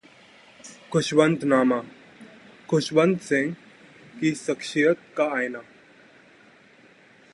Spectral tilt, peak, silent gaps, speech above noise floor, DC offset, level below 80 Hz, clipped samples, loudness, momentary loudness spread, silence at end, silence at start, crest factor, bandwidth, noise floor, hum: -5.5 dB/octave; -4 dBFS; none; 31 dB; under 0.1%; -68 dBFS; under 0.1%; -23 LUFS; 21 LU; 1.7 s; 0.65 s; 22 dB; 11.5 kHz; -54 dBFS; none